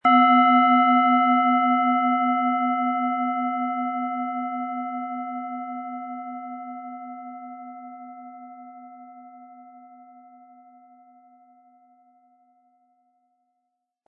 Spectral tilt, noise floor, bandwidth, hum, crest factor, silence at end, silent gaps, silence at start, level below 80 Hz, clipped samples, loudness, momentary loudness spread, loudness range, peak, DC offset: -7 dB/octave; -79 dBFS; 4.1 kHz; none; 18 dB; 4.2 s; none; 0.05 s; -88 dBFS; under 0.1%; -22 LUFS; 25 LU; 24 LU; -6 dBFS; under 0.1%